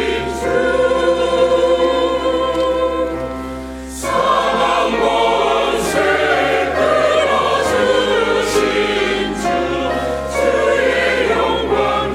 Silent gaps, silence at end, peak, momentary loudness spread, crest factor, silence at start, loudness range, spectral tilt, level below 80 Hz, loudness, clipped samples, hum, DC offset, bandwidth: none; 0 s; -2 dBFS; 6 LU; 14 dB; 0 s; 2 LU; -4 dB/octave; -36 dBFS; -15 LUFS; under 0.1%; none; under 0.1%; 16 kHz